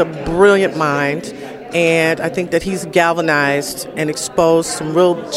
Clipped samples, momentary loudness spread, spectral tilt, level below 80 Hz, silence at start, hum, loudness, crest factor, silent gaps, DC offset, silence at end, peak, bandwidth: under 0.1%; 9 LU; -4.5 dB/octave; -44 dBFS; 0 s; none; -15 LUFS; 16 dB; none; under 0.1%; 0 s; 0 dBFS; 16 kHz